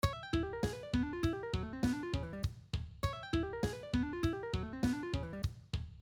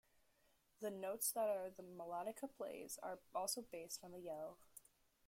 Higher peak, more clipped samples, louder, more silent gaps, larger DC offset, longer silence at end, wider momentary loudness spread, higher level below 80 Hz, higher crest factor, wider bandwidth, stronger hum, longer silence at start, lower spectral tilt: first, -18 dBFS vs -28 dBFS; neither; first, -38 LUFS vs -47 LUFS; neither; neither; second, 0 s vs 0.5 s; second, 6 LU vs 12 LU; first, -46 dBFS vs -84 dBFS; about the same, 20 dB vs 20 dB; first, 19.5 kHz vs 16.5 kHz; neither; second, 0.05 s vs 0.8 s; first, -6.5 dB/octave vs -2.5 dB/octave